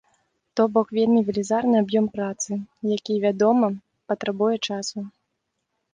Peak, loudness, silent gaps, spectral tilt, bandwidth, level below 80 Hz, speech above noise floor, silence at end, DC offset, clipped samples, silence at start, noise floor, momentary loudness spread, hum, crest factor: -6 dBFS; -23 LUFS; none; -5 dB/octave; 9.8 kHz; -66 dBFS; 55 dB; 0.85 s; under 0.1%; under 0.1%; 0.55 s; -77 dBFS; 11 LU; none; 18 dB